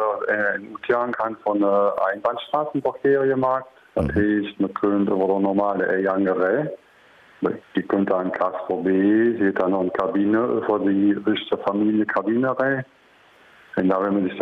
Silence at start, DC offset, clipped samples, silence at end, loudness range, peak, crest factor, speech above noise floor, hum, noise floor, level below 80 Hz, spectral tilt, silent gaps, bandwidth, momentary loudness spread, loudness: 0 s; under 0.1%; under 0.1%; 0 s; 2 LU; -8 dBFS; 14 dB; 32 dB; none; -53 dBFS; -50 dBFS; -8.5 dB/octave; none; 4.7 kHz; 7 LU; -22 LUFS